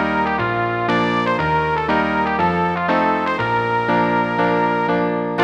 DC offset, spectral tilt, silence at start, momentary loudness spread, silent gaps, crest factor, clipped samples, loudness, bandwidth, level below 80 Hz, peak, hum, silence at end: under 0.1%; -7 dB/octave; 0 s; 2 LU; none; 14 dB; under 0.1%; -18 LUFS; 8.8 kHz; -44 dBFS; -4 dBFS; none; 0 s